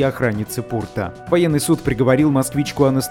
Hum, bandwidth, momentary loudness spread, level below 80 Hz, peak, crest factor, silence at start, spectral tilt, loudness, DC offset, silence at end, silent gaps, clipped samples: none; 17.5 kHz; 9 LU; -42 dBFS; -2 dBFS; 16 dB; 0 s; -6 dB/octave; -18 LUFS; under 0.1%; 0 s; none; under 0.1%